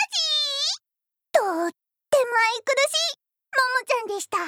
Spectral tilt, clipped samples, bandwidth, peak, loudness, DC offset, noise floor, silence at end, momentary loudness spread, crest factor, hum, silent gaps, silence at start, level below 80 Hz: 0.5 dB/octave; under 0.1%; 18.5 kHz; -6 dBFS; -23 LUFS; under 0.1%; -84 dBFS; 0 s; 7 LU; 18 dB; none; none; 0 s; -82 dBFS